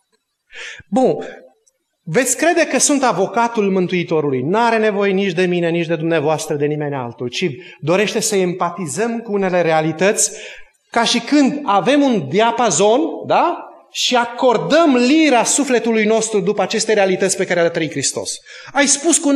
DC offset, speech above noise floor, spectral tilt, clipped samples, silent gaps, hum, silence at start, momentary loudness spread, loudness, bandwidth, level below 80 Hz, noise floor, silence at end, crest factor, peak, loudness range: under 0.1%; 51 dB; -3.5 dB/octave; under 0.1%; none; none; 0.55 s; 9 LU; -16 LUFS; 13 kHz; -64 dBFS; -66 dBFS; 0 s; 16 dB; 0 dBFS; 4 LU